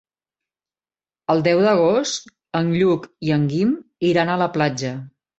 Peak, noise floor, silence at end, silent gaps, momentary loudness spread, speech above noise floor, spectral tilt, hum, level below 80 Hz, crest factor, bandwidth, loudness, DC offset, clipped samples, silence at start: -2 dBFS; under -90 dBFS; 0.3 s; none; 11 LU; over 71 dB; -6 dB/octave; none; -60 dBFS; 18 dB; 8.2 kHz; -20 LUFS; under 0.1%; under 0.1%; 1.3 s